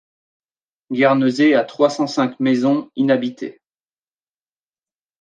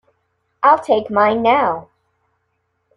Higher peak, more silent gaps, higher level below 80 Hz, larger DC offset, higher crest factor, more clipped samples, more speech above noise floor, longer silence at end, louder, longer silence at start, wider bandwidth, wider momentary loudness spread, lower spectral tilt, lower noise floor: about the same, -2 dBFS vs -2 dBFS; neither; second, -74 dBFS vs -60 dBFS; neither; about the same, 18 dB vs 16 dB; neither; first, over 73 dB vs 54 dB; first, 1.7 s vs 1.1 s; about the same, -17 LUFS vs -15 LUFS; first, 0.9 s vs 0.6 s; second, 9.2 kHz vs 11 kHz; first, 12 LU vs 6 LU; about the same, -6 dB/octave vs -6 dB/octave; first, under -90 dBFS vs -69 dBFS